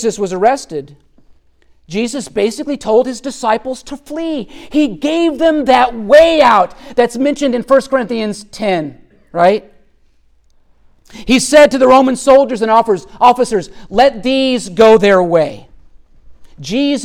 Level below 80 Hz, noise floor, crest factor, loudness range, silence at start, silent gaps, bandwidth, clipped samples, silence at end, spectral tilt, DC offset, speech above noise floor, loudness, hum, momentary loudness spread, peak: -42 dBFS; -50 dBFS; 12 dB; 7 LU; 0 s; none; 15.5 kHz; under 0.1%; 0 s; -4.5 dB/octave; under 0.1%; 38 dB; -12 LUFS; none; 13 LU; 0 dBFS